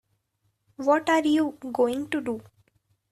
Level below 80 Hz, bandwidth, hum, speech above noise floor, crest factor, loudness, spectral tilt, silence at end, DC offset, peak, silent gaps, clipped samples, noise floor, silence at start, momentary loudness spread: -68 dBFS; 13.5 kHz; none; 49 dB; 18 dB; -25 LUFS; -4.5 dB/octave; 0.7 s; under 0.1%; -10 dBFS; none; under 0.1%; -74 dBFS; 0.8 s; 9 LU